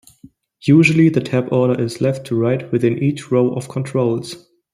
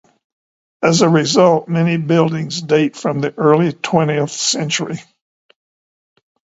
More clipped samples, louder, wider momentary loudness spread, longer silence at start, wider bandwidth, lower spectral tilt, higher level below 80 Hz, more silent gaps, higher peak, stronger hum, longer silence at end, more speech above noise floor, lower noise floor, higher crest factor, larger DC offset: neither; about the same, -17 LUFS vs -15 LUFS; first, 12 LU vs 8 LU; second, 0.65 s vs 0.8 s; first, 13 kHz vs 8 kHz; first, -7.5 dB/octave vs -5 dB/octave; about the same, -58 dBFS vs -60 dBFS; neither; about the same, -2 dBFS vs 0 dBFS; neither; second, 0.35 s vs 1.55 s; second, 31 dB vs over 75 dB; second, -47 dBFS vs under -90 dBFS; about the same, 16 dB vs 16 dB; neither